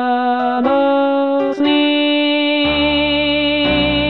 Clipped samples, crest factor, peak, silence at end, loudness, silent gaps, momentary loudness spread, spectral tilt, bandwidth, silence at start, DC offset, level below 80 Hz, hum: under 0.1%; 10 dB; -4 dBFS; 0 s; -14 LUFS; none; 2 LU; -7 dB/octave; 5.6 kHz; 0 s; 0.5%; -38 dBFS; none